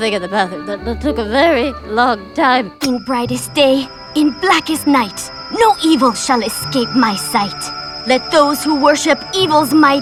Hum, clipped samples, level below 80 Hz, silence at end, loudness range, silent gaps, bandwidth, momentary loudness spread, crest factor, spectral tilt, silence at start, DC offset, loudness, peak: none; under 0.1%; -40 dBFS; 0 s; 2 LU; none; 16.5 kHz; 8 LU; 14 dB; -3.5 dB/octave; 0 s; under 0.1%; -14 LUFS; -2 dBFS